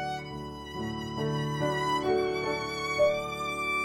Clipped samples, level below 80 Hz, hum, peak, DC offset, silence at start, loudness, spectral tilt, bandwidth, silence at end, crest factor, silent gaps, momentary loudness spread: under 0.1%; -54 dBFS; none; -14 dBFS; under 0.1%; 0 s; -30 LUFS; -5 dB/octave; 16 kHz; 0 s; 16 dB; none; 11 LU